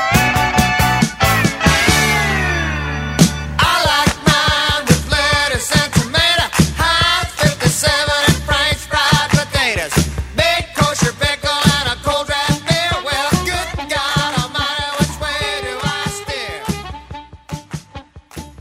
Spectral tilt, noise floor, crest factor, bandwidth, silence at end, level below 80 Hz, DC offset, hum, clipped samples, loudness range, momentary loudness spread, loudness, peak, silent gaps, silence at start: -3.5 dB/octave; -37 dBFS; 16 dB; 16.5 kHz; 0.1 s; -30 dBFS; under 0.1%; none; under 0.1%; 6 LU; 10 LU; -15 LUFS; 0 dBFS; none; 0 s